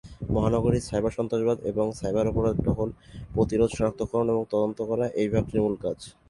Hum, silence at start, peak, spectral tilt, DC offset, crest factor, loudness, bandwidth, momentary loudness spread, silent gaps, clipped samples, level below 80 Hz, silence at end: none; 0.05 s; -8 dBFS; -7.5 dB/octave; under 0.1%; 18 dB; -26 LUFS; 11.5 kHz; 6 LU; none; under 0.1%; -42 dBFS; 0.2 s